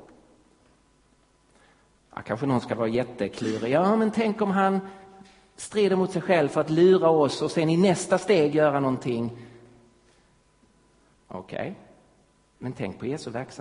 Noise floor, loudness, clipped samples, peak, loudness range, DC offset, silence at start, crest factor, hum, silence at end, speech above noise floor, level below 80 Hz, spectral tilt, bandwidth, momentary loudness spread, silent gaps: -63 dBFS; -24 LUFS; under 0.1%; -8 dBFS; 16 LU; under 0.1%; 2.15 s; 18 dB; none; 0 s; 39 dB; -62 dBFS; -6 dB/octave; 11 kHz; 18 LU; none